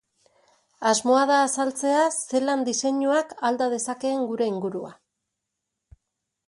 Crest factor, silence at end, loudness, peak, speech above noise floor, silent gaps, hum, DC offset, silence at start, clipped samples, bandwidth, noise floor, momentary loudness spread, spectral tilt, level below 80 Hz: 18 dB; 1.55 s; -23 LUFS; -8 dBFS; 59 dB; none; none; under 0.1%; 0.8 s; under 0.1%; 11.5 kHz; -82 dBFS; 7 LU; -3 dB/octave; -68 dBFS